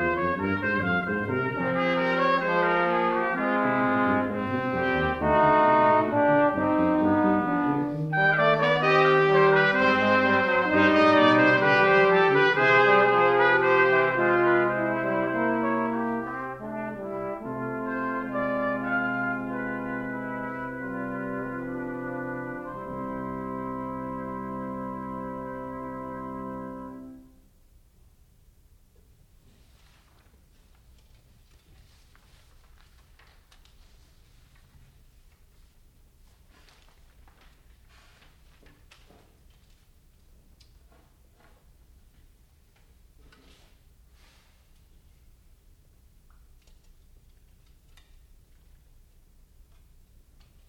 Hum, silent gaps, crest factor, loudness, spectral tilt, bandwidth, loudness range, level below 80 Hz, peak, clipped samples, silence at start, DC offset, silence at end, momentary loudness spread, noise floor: none; none; 18 dB; -24 LUFS; -7 dB/octave; 8.6 kHz; 16 LU; -56 dBFS; -8 dBFS; under 0.1%; 0 s; under 0.1%; 23.5 s; 15 LU; -59 dBFS